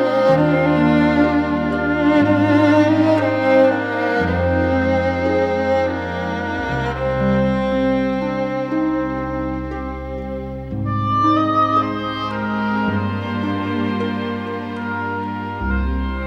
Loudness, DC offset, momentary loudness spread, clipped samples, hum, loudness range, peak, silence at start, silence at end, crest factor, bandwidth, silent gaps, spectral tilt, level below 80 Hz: -18 LUFS; under 0.1%; 10 LU; under 0.1%; none; 7 LU; -2 dBFS; 0 s; 0 s; 16 dB; 7.8 kHz; none; -8 dB/octave; -34 dBFS